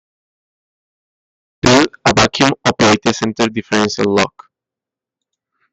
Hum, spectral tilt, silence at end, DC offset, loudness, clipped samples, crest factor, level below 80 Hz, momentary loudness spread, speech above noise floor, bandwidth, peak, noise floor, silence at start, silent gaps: none; -4 dB/octave; 1.45 s; under 0.1%; -14 LUFS; under 0.1%; 16 dB; -42 dBFS; 6 LU; 72 dB; 8.8 kHz; 0 dBFS; -86 dBFS; 1.65 s; none